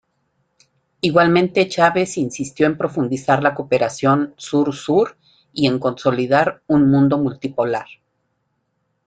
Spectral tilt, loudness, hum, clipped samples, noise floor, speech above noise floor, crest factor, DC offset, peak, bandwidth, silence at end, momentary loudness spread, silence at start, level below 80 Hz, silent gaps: -6 dB/octave; -18 LUFS; none; under 0.1%; -70 dBFS; 53 dB; 16 dB; under 0.1%; -2 dBFS; 9.2 kHz; 1.25 s; 8 LU; 1.05 s; -56 dBFS; none